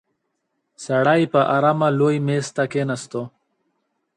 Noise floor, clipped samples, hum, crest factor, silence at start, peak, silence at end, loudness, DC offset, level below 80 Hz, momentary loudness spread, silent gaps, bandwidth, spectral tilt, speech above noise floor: -74 dBFS; under 0.1%; none; 16 dB; 0.8 s; -4 dBFS; 0.9 s; -19 LUFS; under 0.1%; -66 dBFS; 14 LU; none; 11 kHz; -6.5 dB/octave; 55 dB